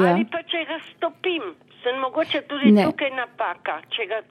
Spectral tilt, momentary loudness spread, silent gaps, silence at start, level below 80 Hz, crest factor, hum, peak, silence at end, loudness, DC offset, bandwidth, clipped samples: -7 dB/octave; 12 LU; none; 0 s; -72 dBFS; 20 dB; none; -4 dBFS; 0.1 s; -23 LUFS; under 0.1%; 11 kHz; under 0.1%